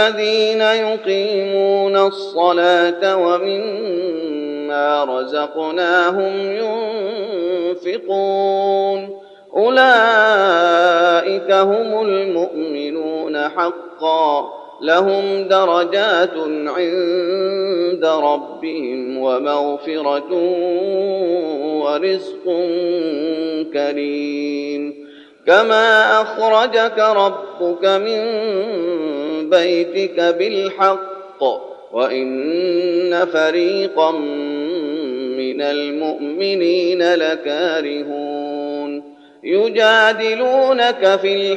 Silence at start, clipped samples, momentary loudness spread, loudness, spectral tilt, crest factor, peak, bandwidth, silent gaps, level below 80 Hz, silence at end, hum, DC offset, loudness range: 0 s; under 0.1%; 10 LU; -17 LUFS; -4.5 dB/octave; 16 dB; 0 dBFS; 8.4 kHz; none; -74 dBFS; 0 s; none; under 0.1%; 5 LU